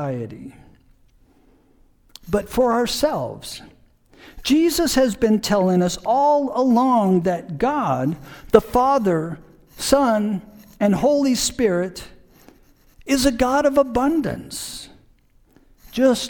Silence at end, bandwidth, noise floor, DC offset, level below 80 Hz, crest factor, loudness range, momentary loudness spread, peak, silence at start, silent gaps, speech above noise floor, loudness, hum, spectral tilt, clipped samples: 0 s; 19 kHz; -55 dBFS; under 0.1%; -44 dBFS; 20 dB; 6 LU; 14 LU; 0 dBFS; 0 s; none; 36 dB; -19 LUFS; none; -5 dB/octave; under 0.1%